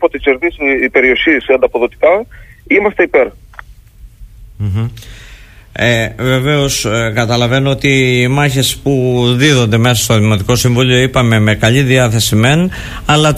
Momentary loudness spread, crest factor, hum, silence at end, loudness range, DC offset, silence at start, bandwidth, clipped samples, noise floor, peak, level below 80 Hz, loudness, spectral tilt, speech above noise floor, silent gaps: 6 LU; 12 dB; none; 0 s; 6 LU; under 0.1%; 0 s; 15.5 kHz; under 0.1%; -37 dBFS; 0 dBFS; -34 dBFS; -11 LUFS; -5 dB/octave; 26 dB; none